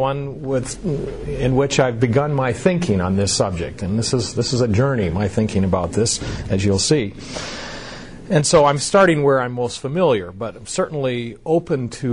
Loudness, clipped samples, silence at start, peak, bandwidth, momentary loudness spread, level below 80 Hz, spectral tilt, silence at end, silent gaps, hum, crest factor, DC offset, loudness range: -19 LUFS; under 0.1%; 0 s; -4 dBFS; 11 kHz; 13 LU; -40 dBFS; -5 dB/octave; 0 s; none; none; 16 dB; under 0.1%; 2 LU